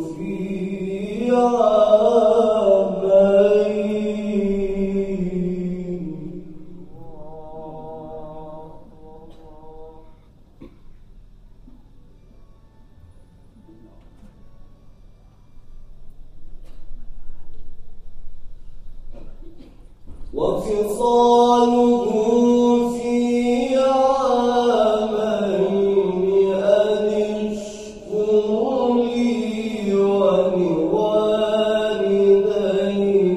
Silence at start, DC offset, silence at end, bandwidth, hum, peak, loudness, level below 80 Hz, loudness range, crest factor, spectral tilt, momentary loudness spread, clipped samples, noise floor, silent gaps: 0 s; under 0.1%; 0 s; 13 kHz; none; -2 dBFS; -18 LUFS; -42 dBFS; 20 LU; 18 dB; -6.5 dB/octave; 18 LU; under 0.1%; -47 dBFS; none